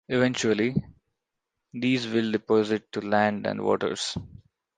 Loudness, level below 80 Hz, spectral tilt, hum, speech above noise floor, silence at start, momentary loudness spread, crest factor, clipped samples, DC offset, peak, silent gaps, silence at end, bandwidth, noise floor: -26 LUFS; -56 dBFS; -5 dB/octave; none; 58 dB; 0.1 s; 7 LU; 20 dB; under 0.1%; under 0.1%; -8 dBFS; none; 0.5 s; 9.6 kHz; -83 dBFS